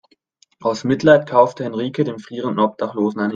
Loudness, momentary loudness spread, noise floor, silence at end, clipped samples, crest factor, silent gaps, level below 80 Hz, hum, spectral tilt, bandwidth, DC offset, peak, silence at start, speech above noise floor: -18 LUFS; 11 LU; -58 dBFS; 0 s; under 0.1%; 18 dB; none; -60 dBFS; none; -6.5 dB/octave; 7.4 kHz; under 0.1%; 0 dBFS; 0.6 s; 41 dB